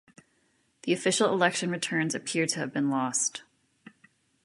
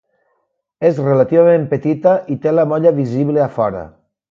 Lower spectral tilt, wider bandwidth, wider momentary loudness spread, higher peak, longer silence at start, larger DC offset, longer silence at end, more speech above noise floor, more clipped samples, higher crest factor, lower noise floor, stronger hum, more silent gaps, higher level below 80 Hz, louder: second, -3.5 dB/octave vs -10 dB/octave; first, 11.5 kHz vs 6.8 kHz; about the same, 6 LU vs 7 LU; second, -8 dBFS vs 0 dBFS; about the same, 0.85 s vs 0.8 s; neither; first, 1 s vs 0.4 s; second, 42 dB vs 54 dB; neither; first, 22 dB vs 14 dB; about the same, -70 dBFS vs -68 dBFS; neither; neither; second, -76 dBFS vs -54 dBFS; second, -27 LUFS vs -15 LUFS